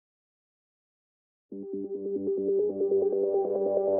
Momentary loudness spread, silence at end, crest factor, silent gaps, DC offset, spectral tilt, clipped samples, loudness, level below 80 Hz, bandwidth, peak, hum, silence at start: 12 LU; 0 s; 14 dB; none; under 0.1%; -9 dB/octave; under 0.1%; -29 LUFS; -80 dBFS; 1.6 kHz; -14 dBFS; none; 1.5 s